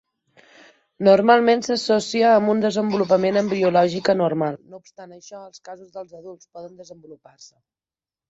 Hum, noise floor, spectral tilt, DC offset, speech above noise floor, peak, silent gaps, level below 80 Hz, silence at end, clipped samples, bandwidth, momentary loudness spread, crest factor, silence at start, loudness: none; under -90 dBFS; -5.5 dB/octave; under 0.1%; over 70 dB; -2 dBFS; none; -66 dBFS; 1.15 s; under 0.1%; 8 kHz; 24 LU; 20 dB; 1 s; -18 LUFS